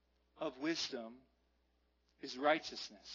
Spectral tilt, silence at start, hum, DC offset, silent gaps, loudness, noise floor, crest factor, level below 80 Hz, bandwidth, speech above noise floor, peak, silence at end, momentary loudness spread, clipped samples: -3 dB/octave; 0.35 s; none; under 0.1%; none; -40 LUFS; -78 dBFS; 22 dB; -78 dBFS; 6 kHz; 37 dB; -20 dBFS; 0 s; 14 LU; under 0.1%